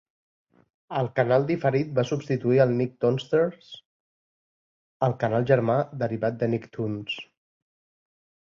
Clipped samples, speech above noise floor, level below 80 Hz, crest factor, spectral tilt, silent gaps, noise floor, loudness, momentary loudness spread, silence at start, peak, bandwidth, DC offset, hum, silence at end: under 0.1%; over 66 dB; -64 dBFS; 20 dB; -8 dB/octave; 3.86-5.00 s; under -90 dBFS; -25 LUFS; 11 LU; 0.9 s; -6 dBFS; 7.2 kHz; under 0.1%; none; 1.2 s